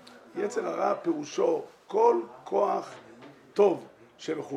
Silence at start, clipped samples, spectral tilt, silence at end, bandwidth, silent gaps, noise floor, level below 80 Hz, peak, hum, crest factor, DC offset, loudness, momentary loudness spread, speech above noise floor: 0.15 s; under 0.1%; -5.5 dB/octave; 0 s; 10.5 kHz; none; -49 dBFS; -82 dBFS; -10 dBFS; none; 20 dB; under 0.1%; -28 LUFS; 13 LU; 22 dB